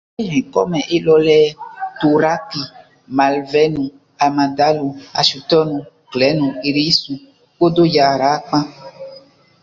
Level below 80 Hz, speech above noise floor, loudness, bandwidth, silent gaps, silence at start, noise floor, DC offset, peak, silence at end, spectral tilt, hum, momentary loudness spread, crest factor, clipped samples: -54 dBFS; 28 dB; -16 LUFS; 7.6 kHz; none; 0.2 s; -44 dBFS; under 0.1%; -2 dBFS; 0.45 s; -5.5 dB/octave; none; 15 LU; 16 dB; under 0.1%